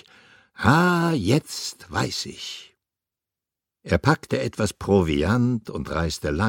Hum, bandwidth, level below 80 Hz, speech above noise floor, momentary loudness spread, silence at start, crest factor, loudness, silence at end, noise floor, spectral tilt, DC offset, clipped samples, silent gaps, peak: none; 17 kHz; -42 dBFS; 66 dB; 12 LU; 0.6 s; 22 dB; -23 LUFS; 0 s; -88 dBFS; -5.5 dB/octave; under 0.1%; under 0.1%; none; 0 dBFS